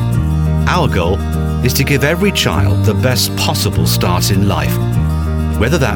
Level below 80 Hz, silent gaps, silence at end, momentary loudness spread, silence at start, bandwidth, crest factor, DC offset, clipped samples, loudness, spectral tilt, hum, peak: -22 dBFS; none; 0 s; 3 LU; 0 s; 18.5 kHz; 12 dB; under 0.1%; under 0.1%; -14 LUFS; -5 dB/octave; none; 0 dBFS